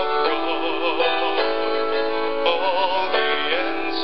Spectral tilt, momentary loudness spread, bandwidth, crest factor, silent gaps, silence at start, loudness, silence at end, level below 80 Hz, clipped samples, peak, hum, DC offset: -5.5 dB/octave; 3 LU; 6 kHz; 18 dB; none; 0 s; -21 LUFS; 0 s; -60 dBFS; under 0.1%; -4 dBFS; none; 4%